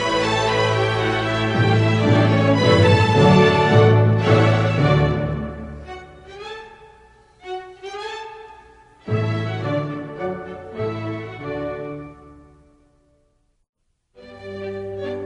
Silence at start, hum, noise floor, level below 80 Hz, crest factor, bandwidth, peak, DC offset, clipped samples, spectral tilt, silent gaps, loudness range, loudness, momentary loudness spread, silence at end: 0 s; none; -63 dBFS; -44 dBFS; 18 dB; 9.8 kHz; -2 dBFS; under 0.1%; under 0.1%; -6.5 dB/octave; 13.69-13.73 s; 20 LU; -18 LUFS; 21 LU; 0 s